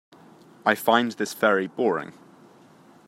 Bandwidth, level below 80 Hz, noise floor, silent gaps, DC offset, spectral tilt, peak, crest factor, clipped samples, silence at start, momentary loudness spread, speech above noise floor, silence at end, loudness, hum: 16 kHz; -78 dBFS; -53 dBFS; none; under 0.1%; -4 dB/octave; -4 dBFS; 22 dB; under 0.1%; 0.65 s; 8 LU; 30 dB; 0.95 s; -23 LUFS; none